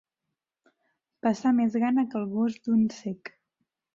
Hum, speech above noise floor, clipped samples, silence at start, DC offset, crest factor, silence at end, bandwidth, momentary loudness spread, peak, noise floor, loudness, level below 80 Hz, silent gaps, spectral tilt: none; 60 dB; under 0.1%; 1.25 s; under 0.1%; 16 dB; 0.65 s; 7.4 kHz; 13 LU; -14 dBFS; -86 dBFS; -27 LUFS; -70 dBFS; none; -7 dB/octave